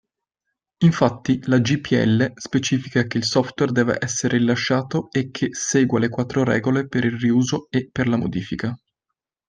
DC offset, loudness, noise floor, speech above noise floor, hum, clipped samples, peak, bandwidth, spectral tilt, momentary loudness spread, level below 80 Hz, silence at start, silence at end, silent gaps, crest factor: under 0.1%; -21 LUFS; -83 dBFS; 63 dB; none; under 0.1%; -2 dBFS; 9.8 kHz; -5.5 dB/octave; 6 LU; -54 dBFS; 0.8 s; 0.7 s; none; 18 dB